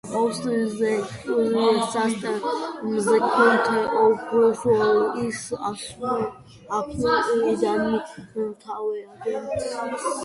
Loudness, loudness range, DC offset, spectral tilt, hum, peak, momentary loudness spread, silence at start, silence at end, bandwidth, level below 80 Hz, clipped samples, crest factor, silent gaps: -23 LUFS; 5 LU; under 0.1%; -4.5 dB/octave; none; -4 dBFS; 11 LU; 0.05 s; 0 s; 11.5 kHz; -56 dBFS; under 0.1%; 18 dB; none